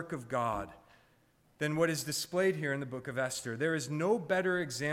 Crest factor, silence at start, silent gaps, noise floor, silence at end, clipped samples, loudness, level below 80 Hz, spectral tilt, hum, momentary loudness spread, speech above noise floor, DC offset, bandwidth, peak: 16 dB; 0 s; none; -68 dBFS; 0 s; under 0.1%; -33 LUFS; -66 dBFS; -4.5 dB/octave; none; 7 LU; 35 dB; under 0.1%; 16 kHz; -18 dBFS